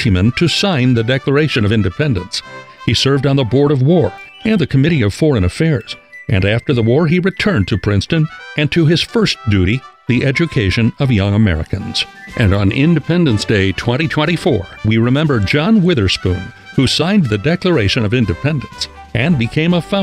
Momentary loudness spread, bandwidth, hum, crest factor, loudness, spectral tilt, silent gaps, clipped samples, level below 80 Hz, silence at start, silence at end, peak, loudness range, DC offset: 7 LU; 12.5 kHz; none; 14 dB; -14 LUFS; -6.5 dB/octave; none; under 0.1%; -38 dBFS; 0 s; 0 s; 0 dBFS; 1 LU; 0.1%